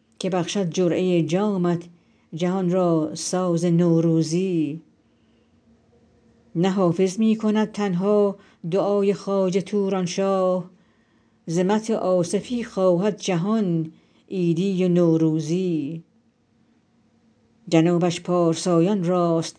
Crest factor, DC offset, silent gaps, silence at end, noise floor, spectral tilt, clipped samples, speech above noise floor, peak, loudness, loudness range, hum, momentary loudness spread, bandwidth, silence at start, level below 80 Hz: 18 dB; under 0.1%; none; 0.1 s; -62 dBFS; -6.5 dB/octave; under 0.1%; 41 dB; -4 dBFS; -22 LUFS; 3 LU; none; 8 LU; 10.5 kHz; 0.2 s; -70 dBFS